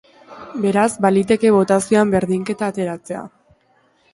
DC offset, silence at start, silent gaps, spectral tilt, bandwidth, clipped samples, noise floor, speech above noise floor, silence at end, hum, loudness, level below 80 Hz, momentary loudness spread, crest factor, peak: under 0.1%; 0.3 s; none; -6 dB/octave; 11.5 kHz; under 0.1%; -59 dBFS; 42 dB; 0.85 s; none; -17 LUFS; -54 dBFS; 14 LU; 16 dB; -2 dBFS